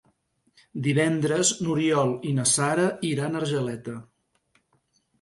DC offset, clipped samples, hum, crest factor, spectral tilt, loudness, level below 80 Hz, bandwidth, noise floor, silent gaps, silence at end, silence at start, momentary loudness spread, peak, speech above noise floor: under 0.1%; under 0.1%; none; 18 dB; -4.5 dB/octave; -24 LUFS; -64 dBFS; 11.5 kHz; -69 dBFS; none; 1.2 s; 0.75 s; 12 LU; -8 dBFS; 45 dB